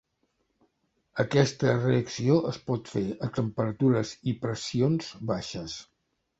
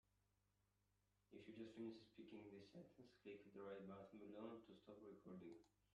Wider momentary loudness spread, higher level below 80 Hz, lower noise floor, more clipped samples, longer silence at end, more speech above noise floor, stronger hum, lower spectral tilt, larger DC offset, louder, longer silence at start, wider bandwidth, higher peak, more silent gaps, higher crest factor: about the same, 9 LU vs 8 LU; first, -60 dBFS vs -90 dBFS; second, -75 dBFS vs -87 dBFS; neither; first, 0.55 s vs 0.1 s; first, 48 dB vs 27 dB; second, none vs 50 Hz at -80 dBFS; about the same, -6.5 dB/octave vs -7 dB/octave; neither; first, -28 LUFS vs -61 LUFS; second, 1.15 s vs 1.3 s; about the same, 8 kHz vs 8.4 kHz; first, -8 dBFS vs -44 dBFS; neither; about the same, 20 dB vs 18 dB